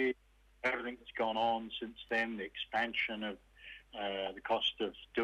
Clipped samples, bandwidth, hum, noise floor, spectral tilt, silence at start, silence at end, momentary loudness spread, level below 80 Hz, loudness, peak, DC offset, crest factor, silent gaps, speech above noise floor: under 0.1%; 13 kHz; none; -66 dBFS; -4.5 dB/octave; 0 s; 0 s; 11 LU; -66 dBFS; -37 LUFS; -20 dBFS; under 0.1%; 18 dB; none; 29 dB